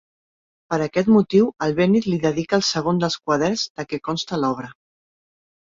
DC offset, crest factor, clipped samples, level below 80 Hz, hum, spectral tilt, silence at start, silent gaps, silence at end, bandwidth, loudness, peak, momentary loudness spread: under 0.1%; 16 dB; under 0.1%; -56 dBFS; none; -5.5 dB/octave; 0.7 s; 3.70-3.75 s; 1.05 s; 7.8 kHz; -20 LUFS; -4 dBFS; 9 LU